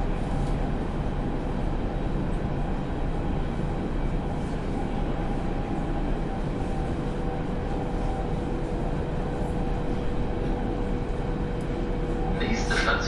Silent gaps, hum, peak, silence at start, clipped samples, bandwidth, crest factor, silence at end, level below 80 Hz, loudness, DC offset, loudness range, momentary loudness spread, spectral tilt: none; none; -12 dBFS; 0 s; under 0.1%; 11 kHz; 16 dB; 0 s; -30 dBFS; -30 LUFS; under 0.1%; 1 LU; 2 LU; -7 dB/octave